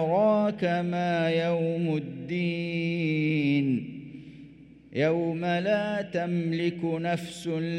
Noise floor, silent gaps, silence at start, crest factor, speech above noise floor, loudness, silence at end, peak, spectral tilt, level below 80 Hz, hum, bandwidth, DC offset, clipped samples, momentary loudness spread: -50 dBFS; none; 0 s; 16 dB; 23 dB; -27 LUFS; 0 s; -12 dBFS; -7.5 dB/octave; -66 dBFS; none; 11.5 kHz; under 0.1%; under 0.1%; 8 LU